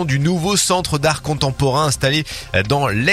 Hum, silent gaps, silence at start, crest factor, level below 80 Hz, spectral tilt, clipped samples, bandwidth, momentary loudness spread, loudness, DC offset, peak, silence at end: none; none; 0 s; 16 dB; -38 dBFS; -4 dB/octave; under 0.1%; 15 kHz; 5 LU; -17 LUFS; under 0.1%; 0 dBFS; 0 s